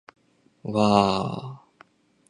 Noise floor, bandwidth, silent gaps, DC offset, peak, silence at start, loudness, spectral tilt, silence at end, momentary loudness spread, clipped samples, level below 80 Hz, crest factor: -57 dBFS; 10 kHz; none; under 0.1%; -2 dBFS; 0.65 s; -23 LUFS; -6 dB/octave; 0.7 s; 20 LU; under 0.1%; -56 dBFS; 24 dB